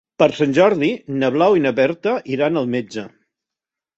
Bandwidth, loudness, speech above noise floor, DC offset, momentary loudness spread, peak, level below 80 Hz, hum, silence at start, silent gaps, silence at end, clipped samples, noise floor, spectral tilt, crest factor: 8 kHz; -18 LUFS; 70 dB; under 0.1%; 8 LU; -2 dBFS; -62 dBFS; none; 0.2 s; none; 0.9 s; under 0.1%; -87 dBFS; -6.5 dB/octave; 16 dB